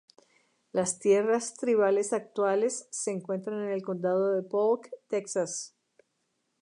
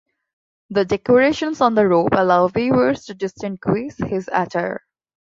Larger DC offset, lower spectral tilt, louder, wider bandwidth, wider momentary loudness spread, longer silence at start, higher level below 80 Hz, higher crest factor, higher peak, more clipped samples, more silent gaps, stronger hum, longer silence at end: neither; second, -4.5 dB/octave vs -6.5 dB/octave; second, -29 LUFS vs -19 LUFS; first, 11 kHz vs 7.6 kHz; about the same, 9 LU vs 11 LU; about the same, 0.75 s vs 0.7 s; second, -82 dBFS vs -52 dBFS; about the same, 16 dB vs 18 dB; second, -12 dBFS vs -2 dBFS; neither; neither; neither; first, 0.95 s vs 0.55 s